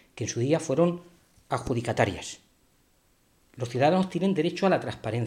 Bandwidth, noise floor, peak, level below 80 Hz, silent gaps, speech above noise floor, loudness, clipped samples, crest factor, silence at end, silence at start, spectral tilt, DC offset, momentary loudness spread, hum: 13 kHz; -65 dBFS; -8 dBFS; -56 dBFS; none; 39 dB; -27 LUFS; under 0.1%; 20 dB; 0 s; 0.15 s; -6 dB/octave; under 0.1%; 14 LU; none